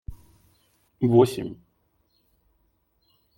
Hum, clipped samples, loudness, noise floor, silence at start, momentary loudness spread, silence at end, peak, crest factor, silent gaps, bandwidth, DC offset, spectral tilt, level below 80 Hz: none; under 0.1%; -22 LUFS; -69 dBFS; 0.1 s; 26 LU; 1.85 s; -6 dBFS; 22 dB; none; 16 kHz; under 0.1%; -8 dB/octave; -52 dBFS